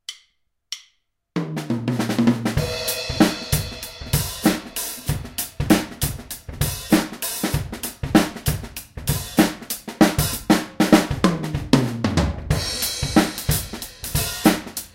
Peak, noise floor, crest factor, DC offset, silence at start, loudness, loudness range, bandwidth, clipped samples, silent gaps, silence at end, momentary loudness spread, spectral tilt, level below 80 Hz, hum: 0 dBFS; -67 dBFS; 22 dB; under 0.1%; 0.1 s; -22 LUFS; 4 LU; 17 kHz; under 0.1%; none; 0.05 s; 11 LU; -4.5 dB/octave; -36 dBFS; none